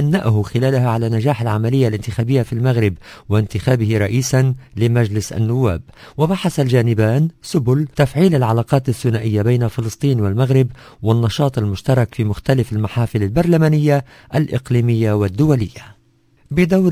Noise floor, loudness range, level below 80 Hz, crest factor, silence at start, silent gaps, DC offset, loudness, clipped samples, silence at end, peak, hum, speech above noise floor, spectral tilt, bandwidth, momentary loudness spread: -55 dBFS; 1 LU; -38 dBFS; 16 dB; 0 s; none; under 0.1%; -17 LUFS; under 0.1%; 0 s; 0 dBFS; none; 39 dB; -7.5 dB/octave; 16 kHz; 5 LU